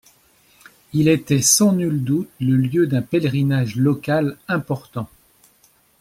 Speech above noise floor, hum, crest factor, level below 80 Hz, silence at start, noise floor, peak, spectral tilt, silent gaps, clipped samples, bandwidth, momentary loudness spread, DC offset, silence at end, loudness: 39 dB; none; 18 dB; -56 dBFS; 0.95 s; -57 dBFS; -2 dBFS; -5 dB/octave; none; under 0.1%; 16 kHz; 12 LU; under 0.1%; 0.95 s; -19 LUFS